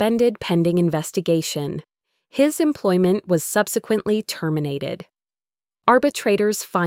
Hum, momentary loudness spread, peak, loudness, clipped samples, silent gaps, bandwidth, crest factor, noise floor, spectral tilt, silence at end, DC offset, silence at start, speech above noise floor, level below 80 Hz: none; 10 LU; -2 dBFS; -21 LUFS; under 0.1%; none; 16.5 kHz; 18 dB; under -90 dBFS; -5.5 dB/octave; 0 s; under 0.1%; 0 s; over 70 dB; -58 dBFS